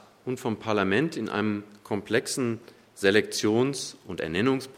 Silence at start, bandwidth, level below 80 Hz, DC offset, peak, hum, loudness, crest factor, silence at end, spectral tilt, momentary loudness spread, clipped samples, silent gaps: 0.25 s; 16 kHz; -66 dBFS; under 0.1%; -6 dBFS; none; -27 LUFS; 20 dB; 0 s; -4.5 dB/octave; 11 LU; under 0.1%; none